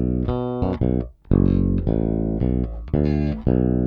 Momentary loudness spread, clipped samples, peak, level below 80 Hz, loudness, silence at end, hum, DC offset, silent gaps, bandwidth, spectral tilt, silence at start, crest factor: 5 LU; under 0.1%; -2 dBFS; -28 dBFS; -22 LUFS; 0 s; none; under 0.1%; none; 5.2 kHz; -12 dB/octave; 0 s; 18 dB